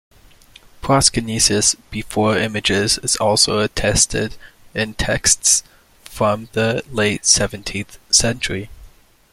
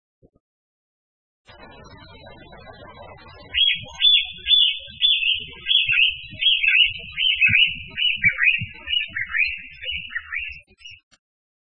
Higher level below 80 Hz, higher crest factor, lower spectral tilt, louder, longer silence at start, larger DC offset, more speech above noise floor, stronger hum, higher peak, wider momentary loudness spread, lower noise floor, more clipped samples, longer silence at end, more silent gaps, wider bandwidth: first, -38 dBFS vs -50 dBFS; about the same, 20 dB vs 20 dB; about the same, -2.5 dB/octave vs -2 dB/octave; about the same, -16 LUFS vs -18 LUFS; second, 0.85 s vs 1.6 s; second, under 0.1% vs 0.3%; first, 29 dB vs 20 dB; neither; first, 0 dBFS vs -4 dBFS; about the same, 12 LU vs 14 LU; about the same, -47 dBFS vs -44 dBFS; neither; second, 0.45 s vs 0.65 s; neither; first, 16.5 kHz vs 7 kHz